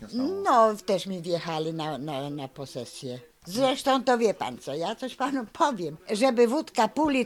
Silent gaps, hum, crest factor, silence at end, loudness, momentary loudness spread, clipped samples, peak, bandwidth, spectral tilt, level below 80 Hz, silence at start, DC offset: none; none; 18 dB; 0 s; -26 LUFS; 15 LU; under 0.1%; -8 dBFS; 17 kHz; -4.5 dB/octave; -64 dBFS; 0 s; under 0.1%